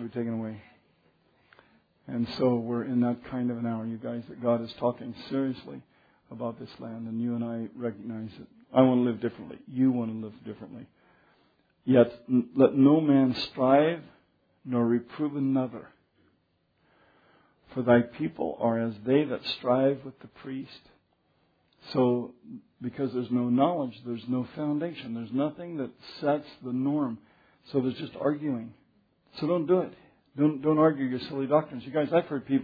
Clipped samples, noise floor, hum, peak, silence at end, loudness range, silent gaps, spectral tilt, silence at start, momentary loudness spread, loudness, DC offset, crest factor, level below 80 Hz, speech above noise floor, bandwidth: under 0.1%; -71 dBFS; none; -6 dBFS; 0 s; 8 LU; none; -9.5 dB/octave; 0 s; 17 LU; -28 LUFS; under 0.1%; 22 dB; -70 dBFS; 44 dB; 5 kHz